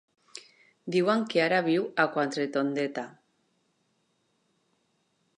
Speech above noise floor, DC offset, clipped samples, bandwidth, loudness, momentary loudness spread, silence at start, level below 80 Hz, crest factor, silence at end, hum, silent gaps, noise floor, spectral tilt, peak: 46 dB; under 0.1%; under 0.1%; 11 kHz; -27 LUFS; 22 LU; 0.35 s; -84 dBFS; 22 dB; 2.3 s; none; none; -73 dBFS; -5.5 dB/octave; -8 dBFS